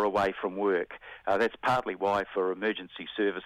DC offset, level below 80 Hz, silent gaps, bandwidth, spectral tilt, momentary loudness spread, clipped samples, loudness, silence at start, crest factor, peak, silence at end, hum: under 0.1%; -64 dBFS; none; 13 kHz; -5.5 dB/octave; 10 LU; under 0.1%; -30 LUFS; 0 s; 16 dB; -14 dBFS; 0 s; none